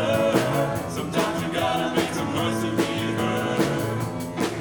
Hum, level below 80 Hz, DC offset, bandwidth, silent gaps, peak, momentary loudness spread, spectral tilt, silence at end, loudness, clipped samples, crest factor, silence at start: none; -52 dBFS; under 0.1%; over 20 kHz; none; -6 dBFS; 6 LU; -5 dB/octave; 0 s; -24 LUFS; under 0.1%; 18 dB; 0 s